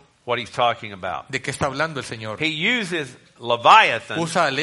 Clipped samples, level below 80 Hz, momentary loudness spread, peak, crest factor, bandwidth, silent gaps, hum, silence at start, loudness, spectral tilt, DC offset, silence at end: under 0.1%; -56 dBFS; 17 LU; 0 dBFS; 22 dB; 11.5 kHz; none; none; 0.25 s; -20 LUFS; -3.5 dB/octave; under 0.1%; 0 s